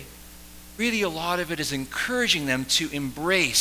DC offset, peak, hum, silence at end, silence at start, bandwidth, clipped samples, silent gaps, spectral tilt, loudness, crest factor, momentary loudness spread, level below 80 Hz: under 0.1%; -8 dBFS; none; 0 s; 0 s; 16 kHz; under 0.1%; none; -2.5 dB/octave; -24 LUFS; 18 dB; 21 LU; -50 dBFS